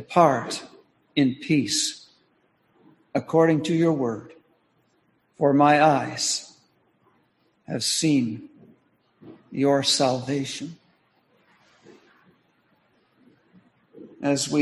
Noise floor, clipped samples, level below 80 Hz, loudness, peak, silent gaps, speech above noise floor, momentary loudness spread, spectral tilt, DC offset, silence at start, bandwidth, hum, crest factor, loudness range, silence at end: -66 dBFS; under 0.1%; -68 dBFS; -23 LUFS; -4 dBFS; none; 45 dB; 15 LU; -4 dB/octave; under 0.1%; 0 s; 12.5 kHz; none; 22 dB; 6 LU; 0 s